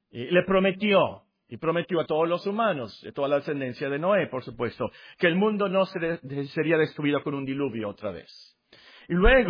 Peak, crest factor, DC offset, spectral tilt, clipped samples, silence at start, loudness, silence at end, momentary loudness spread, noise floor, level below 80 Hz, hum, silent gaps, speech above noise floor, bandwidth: -6 dBFS; 20 dB; under 0.1%; -8.5 dB/octave; under 0.1%; 0.15 s; -26 LUFS; 0 s; 11 LU; -53 dBFS; -40 dBFS; none; none; 28 dB; 5.2 kHz